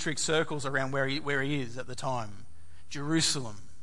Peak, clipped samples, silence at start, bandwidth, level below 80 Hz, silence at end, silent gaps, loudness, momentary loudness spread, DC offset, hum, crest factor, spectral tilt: -14 dBFS; under 0.1%; 0 s; 11.5 kHz; -62 dBFS; 0.2 s; none; -31 LUFS; 12 LU; 2%; none; 18 dB; -3.5 dB/octave